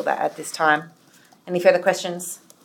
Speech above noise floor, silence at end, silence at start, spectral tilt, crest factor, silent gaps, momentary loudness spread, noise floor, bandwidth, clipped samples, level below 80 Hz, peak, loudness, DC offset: 33 dB; 0.3 s; 0 s; -3.5 dB/octave; 20 dB; none; 12 LU; -54 dBFS; 17.5 kHz; under 0.1%; -82 dBFS; -2 dBFS; -21 LUFS; under 0.1%